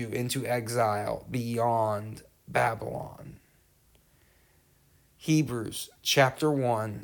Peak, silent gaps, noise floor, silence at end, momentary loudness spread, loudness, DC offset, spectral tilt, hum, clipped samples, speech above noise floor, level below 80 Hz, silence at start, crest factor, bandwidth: -10 dBFS; none; -64 dBFS; 0 s; 15 LU; -28 LUFS; under 0.1%; -5 dB/octave; none; under 0.1%; 35 dB; -62 dBFS; 0 s; 20 dB; 19.5 kHz